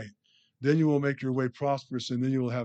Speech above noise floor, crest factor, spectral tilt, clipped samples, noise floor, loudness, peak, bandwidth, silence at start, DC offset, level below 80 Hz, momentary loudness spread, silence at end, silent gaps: 38 dB; 16 dB; -7.5 dB/octave; under 0.1%; -66 dBFS; -28 LUFS; -12 dBFS; 8.4 kHz; 0 s; under 0.1%; -76 dBFS; 8 LU; 0 s; none